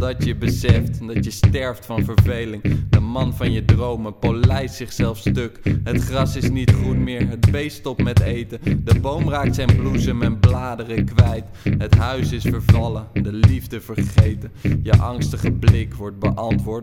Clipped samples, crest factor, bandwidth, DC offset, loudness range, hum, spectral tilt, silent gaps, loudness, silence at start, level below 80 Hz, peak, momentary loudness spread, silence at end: under 0.1%; 18 dB; 16 kHz; under 0.1%; 1 LU; none; -7 dB/octave; none; -19 LUFS; 0 s; -30 dBFS; 0 dBFS; 7 LU; 0 s